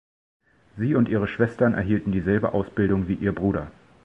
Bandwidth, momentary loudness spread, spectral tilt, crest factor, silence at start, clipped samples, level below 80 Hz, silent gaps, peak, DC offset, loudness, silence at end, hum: 5.6 kHz; 5 LU; -10 dB/octave; 18 dB; 0.75 s; under 0.1%; -44 dBFS; none; -6 dBFS; under 0.1%; -24 LUFS; 0.35 s; none